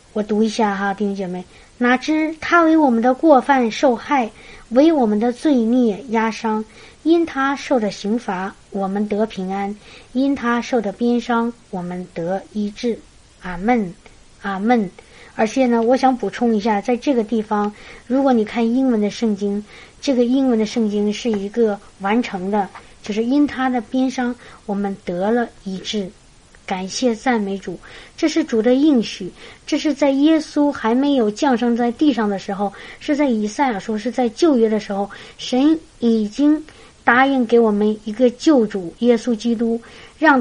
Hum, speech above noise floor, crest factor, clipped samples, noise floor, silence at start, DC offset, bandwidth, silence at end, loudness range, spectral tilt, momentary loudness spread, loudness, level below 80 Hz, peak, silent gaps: none; 29 dB; 18 dB; under 0.1%; -47 dBFS; 0.15 s; under 0.1%; 10.5 kHz; 0 s; 6 LU; -5.5 dB/octave; 12 LU; -19 LUFS; -50 dBFS; 0 dBFS; none